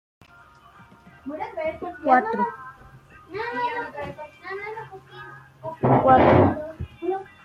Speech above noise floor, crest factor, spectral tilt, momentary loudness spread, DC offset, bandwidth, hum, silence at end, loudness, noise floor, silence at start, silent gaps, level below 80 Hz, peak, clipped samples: 31 dB; 20 dB; -9 dB/octave; 25 LU; under 0.1%; 7 kHz; none; 0.2 s; -22 LUFS; -51 dBFS; 1.25 s; none; -52 dBFS; -4 dBFS; under 0.1%